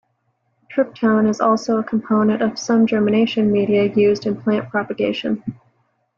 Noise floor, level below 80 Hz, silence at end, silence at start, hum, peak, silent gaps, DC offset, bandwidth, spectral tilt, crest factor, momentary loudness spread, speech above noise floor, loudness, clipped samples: -68 dBFS; -58 dBFS; 0.65 s; 0.7 s; none; -6 dBFS; none; under 0.1%; 7.2 kHz; -6 dB/octave; 14 dB; 7 LU; 50 dB; -18 LUFS; under 0.1%